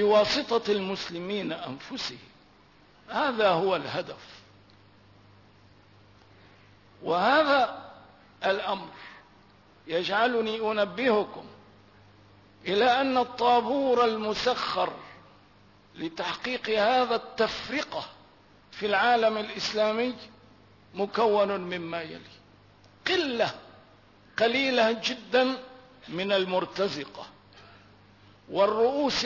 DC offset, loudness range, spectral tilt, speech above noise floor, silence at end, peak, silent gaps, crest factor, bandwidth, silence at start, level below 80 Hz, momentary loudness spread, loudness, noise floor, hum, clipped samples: under 0.1%; 4 LU; -4 dB/octave; 31 dB; 0 s; -12 dBFS; none; 16 dB; 6 kHz; 0 s; -66 dBFS; 17 LU; -27 LUFS; -58 dBFS; 50 Hz at -60 dBFS; under 0.1%